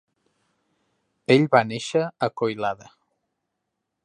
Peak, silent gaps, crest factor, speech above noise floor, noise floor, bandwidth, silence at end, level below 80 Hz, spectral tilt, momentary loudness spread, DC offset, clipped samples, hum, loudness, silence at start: -2 dBFS; none; 22 dB; 58 dB; -80 dBFS; 10.5 kHz; 1.3 s; -70 dBFS; -6 dB/octave; 13 LU; under 0.1%; under 0.1%; none; -22 LUFS; 1.3 s